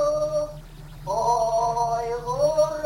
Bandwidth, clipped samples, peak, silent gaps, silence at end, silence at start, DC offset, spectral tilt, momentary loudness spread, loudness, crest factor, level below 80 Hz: 17 kHz; under 0.1%; -10 dBFS; none; 0 s; 0 s; under 0.1%; -4.5 dB/octave; 15 LU; -24 LUFS; 14 dB; -44 dBFS